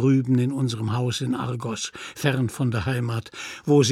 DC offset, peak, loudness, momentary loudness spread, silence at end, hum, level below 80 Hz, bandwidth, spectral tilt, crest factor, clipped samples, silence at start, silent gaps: under 0.1%; -6 dBFS; -25 LUFS; 10 LU; 0 s; none; -54 dBFS; 14 kHz; -6 dB/octave; 18 dB; under 0.1%; 0 s; none